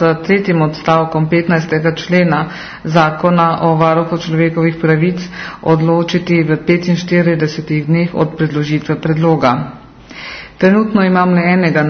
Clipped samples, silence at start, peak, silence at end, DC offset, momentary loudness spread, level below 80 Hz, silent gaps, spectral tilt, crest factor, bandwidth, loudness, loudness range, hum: under 0.1%; 0 s; 0 dBFS; 0 s; under 0.1%; 7 LU; -46 dBFS; none; -7.5 dB/octave; 12 dB; 6.6 kHz; -13 LUFS; 2 LU; none